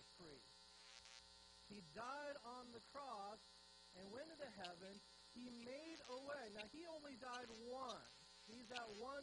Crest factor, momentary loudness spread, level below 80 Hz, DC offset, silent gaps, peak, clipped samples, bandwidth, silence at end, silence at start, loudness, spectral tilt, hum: 22 dB; 10 LU; -82 dBFS; under 0.1%; none; -34 dBFS; under 0.1%; 10 kHz; 0 s; 0 s; -56 LUFS; -3 dB/octave; none